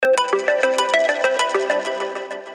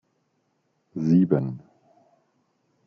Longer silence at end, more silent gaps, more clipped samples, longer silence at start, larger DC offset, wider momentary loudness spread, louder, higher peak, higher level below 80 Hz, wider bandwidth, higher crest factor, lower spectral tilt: second, 0 s vs 1.3 s; neither; neither; second, 0 s vs 0.95 s; neither; second, 9 LU vs 20 LU; first, -19 LUFS vs -23 LUFS; about the same, -6 dBFS vs -6 dBFS; about the same, -70 dBFS vs -68 dBFS; first, 13 kHz vs 6.4 kHz; second, 14 dB vs 20 dB; second, -1 dB/octave vs -10.5 dB/octave